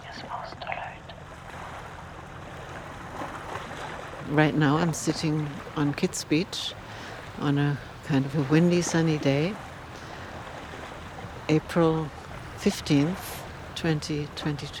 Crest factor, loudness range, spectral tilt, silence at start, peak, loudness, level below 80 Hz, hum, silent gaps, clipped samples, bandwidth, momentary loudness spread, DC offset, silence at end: 22 dB; 12 LU; -5.5 dB/octave; 0 s; -6 dBFS; -27 LUFS; -52 dBFS; none; none; under 0.1%; 17 kHz; 17 LU; under 0.1%; 0 s